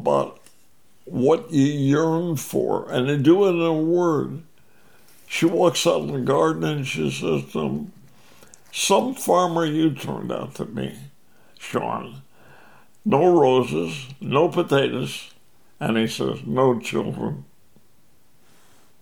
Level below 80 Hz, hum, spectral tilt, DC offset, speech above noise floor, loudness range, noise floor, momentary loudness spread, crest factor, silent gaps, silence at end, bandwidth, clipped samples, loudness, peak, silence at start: -62 dBFS; none; -5.5 dB/octave; 0.3%; 40 dB; 5 LU; -61 dBFS; 14 LU; 18 dB; none; 1.55 s; 20 kHz; under 0.1%; -22 LUFS; -4 dBFS; 0 s